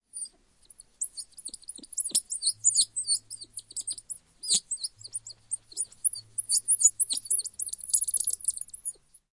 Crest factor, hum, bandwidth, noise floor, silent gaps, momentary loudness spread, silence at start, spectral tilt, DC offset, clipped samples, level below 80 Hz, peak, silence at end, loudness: 24 dB; none; 11.5 kHz; -59 dBFS; none; 16 LU; 0.15 s; 2.5 dB/octave; under 0.1%; under 0.1%; -68 dBFS; -8 dBFS; 0.4 s; -27 LUFS